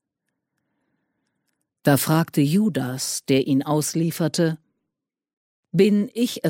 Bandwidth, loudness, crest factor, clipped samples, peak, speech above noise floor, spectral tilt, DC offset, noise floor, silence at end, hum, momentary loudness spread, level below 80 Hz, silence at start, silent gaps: 17 kHz; -21 LUFS; 18 dB; under 0.1%; -4 dBFS; 63 dB; -5.5 dB/octave; under 0.1%; -84 dBFS; 0 s; none; 7 LU; -66 dBFS; 1.85 s; 5.33-5.63 s